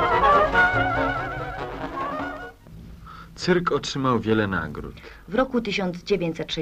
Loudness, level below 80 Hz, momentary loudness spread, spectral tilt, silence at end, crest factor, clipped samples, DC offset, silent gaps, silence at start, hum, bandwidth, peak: -23 LUFS; -42 dBFS; 22 LU; -5.5 dB/octave; 0 s; 18 dB; under 0.1%; under 0.1%; none; 0 s; none; 15.5 kHz; -6 dBFS